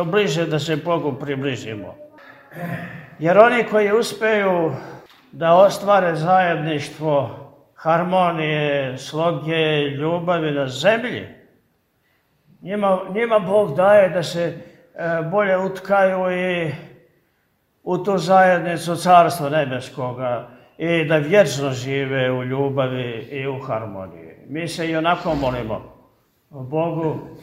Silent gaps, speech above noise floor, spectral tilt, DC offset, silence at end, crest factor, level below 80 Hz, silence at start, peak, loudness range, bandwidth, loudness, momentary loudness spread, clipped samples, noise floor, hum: none; 47 dB; -5.5 dB/octave; under 0.1%; 0 s; 20 dB; -54 dBFS; 0 s; 0 dBFS; 6 LU; 16 kHz; -19 LUFS; 15 LU; under 0.1%; -65 dBFS; none